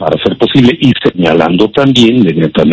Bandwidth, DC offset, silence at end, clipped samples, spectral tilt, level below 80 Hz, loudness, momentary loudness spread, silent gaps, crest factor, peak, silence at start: 8 kHz; under 0.1%; 0 s; 4%; -6.5 dB/octave; -38 dBFS; -8 LUFS; 4 LU; none; 8 dB; 0 dBFS; 0 s